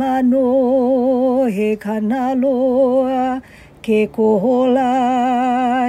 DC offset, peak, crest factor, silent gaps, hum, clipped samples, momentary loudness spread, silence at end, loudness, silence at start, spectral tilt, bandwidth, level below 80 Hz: under 0.1%; -4 dBFS; 10 dB; none; none; under 0.1%; 5 LU; 0 s; -16 LUFS; 0 s; -7 dB/octave; 10 kHz; -54 dBFS